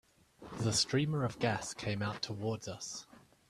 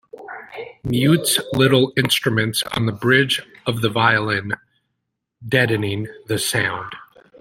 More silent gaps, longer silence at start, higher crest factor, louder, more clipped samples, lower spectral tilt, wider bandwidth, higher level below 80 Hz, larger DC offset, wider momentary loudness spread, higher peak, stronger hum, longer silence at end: neither; first, 0.4 s vs 0.15 s; about the same, 20 dB vs 18 dB; second, -35 LUFS vs -19 LUFS; neither; about the same, -4 dB/octave vs -4.5 dB/octave; second, 13.5 kHz vs 16.5 kHz; second, -64 dBFS vs -52 dBFS; neither; second, 12 LU vs 18 LU; second, -18 dBFS vs -2 dBFS; neither; about the same, 0.3 s vs 0.35 s